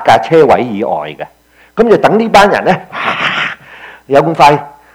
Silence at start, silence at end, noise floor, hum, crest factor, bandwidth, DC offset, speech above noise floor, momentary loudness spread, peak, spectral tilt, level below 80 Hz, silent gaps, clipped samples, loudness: 0 s; 0.25 s; -34 dBFS; none; 10 dB; 16.5 kHz; under 0.1%; 25 dB; 15 LU; 0 dBFS; -5.5 dB/octave; -42 dBFS; none; 2%; -10 LUFS